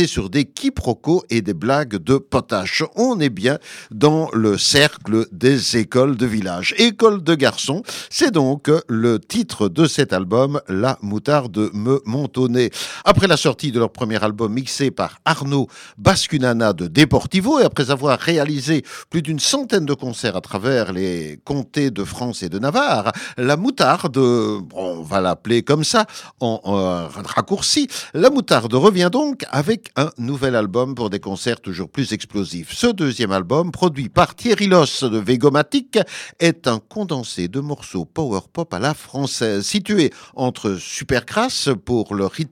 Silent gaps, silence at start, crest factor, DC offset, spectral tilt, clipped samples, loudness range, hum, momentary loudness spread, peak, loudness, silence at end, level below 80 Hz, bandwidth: none; 0 s; 18 dB; under 0.1%; -5 dB/octave; under 0.1%; 5 LU; none; 9 LU; 0 dBFS; -18 LUFS; 0.05 s; -46 dBFS; 16.5 kHz